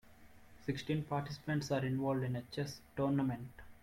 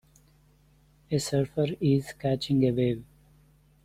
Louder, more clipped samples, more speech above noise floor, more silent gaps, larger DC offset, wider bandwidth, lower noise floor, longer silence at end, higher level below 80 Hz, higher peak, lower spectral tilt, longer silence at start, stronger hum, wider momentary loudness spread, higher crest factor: second, -38 LUFS vs -28 LUFS; neither; second, 21 dB vs 35 dB; neither; neither; first, 16.5 kHz vs 14.5 kHz; about the same, -59 dBFS vs -61 dBFS; second, 0.05 s vs 0.8 s; second, -64 dBFS vs -58 dBFS; second, -24 dBFS vs -12 dBFS; about the same, -7 dB/octave vs -6.5 dB/octave; second, 0.05 s vs 1.1 s; neither; about the same, 8 LU vs 6 LU; about the same, 14 dB vs 18 dB